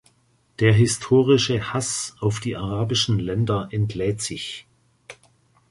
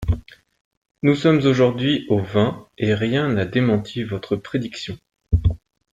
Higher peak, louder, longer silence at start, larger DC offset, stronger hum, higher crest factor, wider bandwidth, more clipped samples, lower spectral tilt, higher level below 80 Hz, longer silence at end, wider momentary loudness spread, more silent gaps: about the same, -4 dBFS vs -4 dBFS; about the same, -22 LUFS vs -21 LUFS; first, 0.6 s vs 0 s; neither; neither; about the same, 18 dB vs 16 dB; first, 11.5 kHz vs 9 kHz; neither; second, -5 dB/octave vs -7.5 dB/octave; second, -48 dBFS vs -34 dBFS; first, 0.55 s vs 0.4 s; about the same, 10 LU vs 11 LU; second, none vs 0.61-0.71 s, 0.77-0.82 s